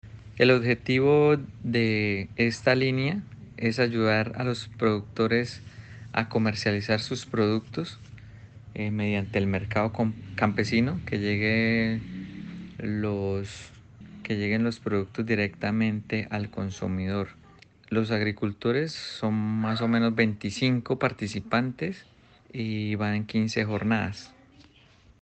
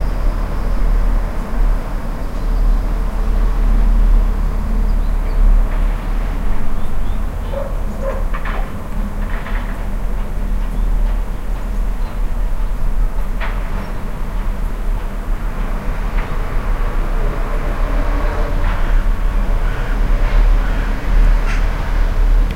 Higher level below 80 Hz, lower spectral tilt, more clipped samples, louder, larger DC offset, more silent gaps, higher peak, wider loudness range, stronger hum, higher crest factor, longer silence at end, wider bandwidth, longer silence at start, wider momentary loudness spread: second, -56 dBFS vs -16 dBFS; about the same, -6.5 dB/octave vs -7 dB/octave; neither; second, -27 LUFS vs -22 LUFS; neither; neither; second, -8 dBFS vs -2 dBFS; about the same, 5 LU vs 5 LU; neither; first, 20 dB vs 12 dB; first, 0.95 s vs 0 s; first, 8.6 kHz vs 6.4 kHz; about the same, 0.05 s vs 0 s; first, 12 LU vs 8 LU